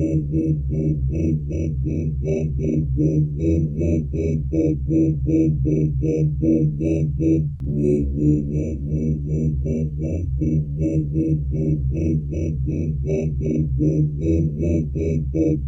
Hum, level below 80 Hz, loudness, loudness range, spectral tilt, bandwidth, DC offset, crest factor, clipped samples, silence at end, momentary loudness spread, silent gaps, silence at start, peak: none; -30 dBFS; -21 LUFS; 2 LU; -11 dB/octave; 6.4 kHz; under 0.1%; 14 dB; under 0.1%; 0 s; 4 LU; none; 0 s; -6 dBFS